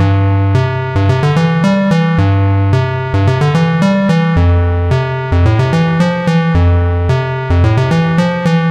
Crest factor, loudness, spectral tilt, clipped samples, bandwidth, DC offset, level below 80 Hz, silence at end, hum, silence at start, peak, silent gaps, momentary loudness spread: 10 dB; -12 LUFS; -8 dB/octave; under 0.1%; 8.8 kHz; 0.1%; -26 dBFS; 0 s; none; 0 s; -2 dBFS; none; 3 LU